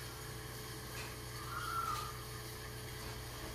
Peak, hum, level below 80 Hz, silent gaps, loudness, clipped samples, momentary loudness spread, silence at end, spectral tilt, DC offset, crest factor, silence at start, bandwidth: -28 dBFS; none; -56 dBFS; none; -44 LUFS; under 0.1%; 7 LU; 0 s; -3.5 dB/octave; under 0.1%; 16 dB; 0 s; 15.5 kHz